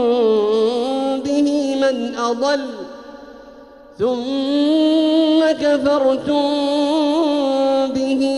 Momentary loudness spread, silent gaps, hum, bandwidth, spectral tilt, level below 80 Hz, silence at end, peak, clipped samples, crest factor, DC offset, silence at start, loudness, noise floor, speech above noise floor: 6 LU; none; none; 11 kHz; -4.5 dB/octave; -56 dBFS; 0 s; -4 dBFS; under 0.1%; 12 dB; under 0.1%; 0 s; -17 LUFS; -41 dBFS; 25 dB